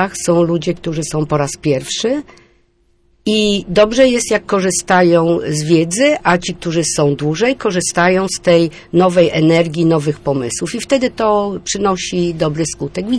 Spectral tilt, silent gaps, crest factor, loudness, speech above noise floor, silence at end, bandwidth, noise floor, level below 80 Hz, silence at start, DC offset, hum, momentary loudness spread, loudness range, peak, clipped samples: -4.5 dB/octave; none; 14 dB; -15 LUFS; 42 dB; 0 s; 11 kHz; -56 dBFS; -42 dBFS; 0 s; under 0.1%; none; 7 LU; 4 LU; 0 dBFS; under 0.1%